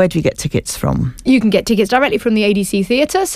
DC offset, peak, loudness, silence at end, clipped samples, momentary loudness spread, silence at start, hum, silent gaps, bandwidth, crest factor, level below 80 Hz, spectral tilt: under 0.1%; -2 dBFS; -15 LUFS; 0 s; under 0.1%; 6 LU; 0 s; none; none; 15.5 kHz; 14 dB; -36 dBFS; -5 dB/octave